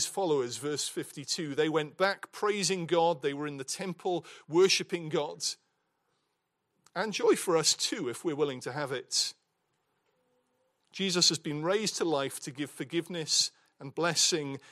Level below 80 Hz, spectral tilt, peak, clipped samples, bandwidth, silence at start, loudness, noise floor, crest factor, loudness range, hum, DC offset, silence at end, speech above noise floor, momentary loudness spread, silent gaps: -82 dBFS; -2.5 dB/octave; -10 dBFS; under 0.1%; 15.5 kHz; 0 s; -30 LUFS; -80 dBFS; 22 dB; 2 LU; none; under 0.1%; 0.15 s; 50 dB; 11 LU; none